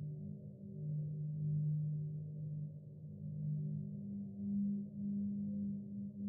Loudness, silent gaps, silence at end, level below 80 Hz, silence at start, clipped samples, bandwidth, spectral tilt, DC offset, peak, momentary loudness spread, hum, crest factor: -43 LUFS; none; 0 s; -76 dBFS; 0 s; under 0.1%; 0.7 kHz; -19 dB/octave; under 0.1%; -30 dBFS; 11 LU; none; 10 dB